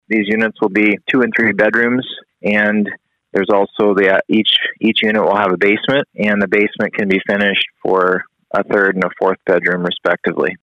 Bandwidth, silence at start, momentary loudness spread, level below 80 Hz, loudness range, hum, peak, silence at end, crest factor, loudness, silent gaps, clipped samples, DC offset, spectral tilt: 7.8 kHz; 0.1 s; 6 LU; -58 dBFS; 2 LU; none; -2 dBFS; 0.05 s; 14 dB; -15 LUFS; none; under 0.1%; under 0.1%; -6.5 dB/octave